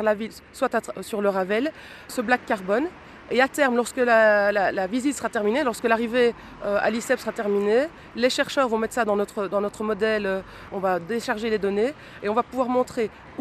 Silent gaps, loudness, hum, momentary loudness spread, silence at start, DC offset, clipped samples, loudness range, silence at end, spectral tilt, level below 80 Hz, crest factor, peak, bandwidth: none; -24 LUFS; none; 10 LU; 0 s; under 0.1%; under 0.1%; 4 LU; 0 s; -4.5 dB/octave; -56 dBFS; 18 dB; -6 dBFS; 14.5 kHz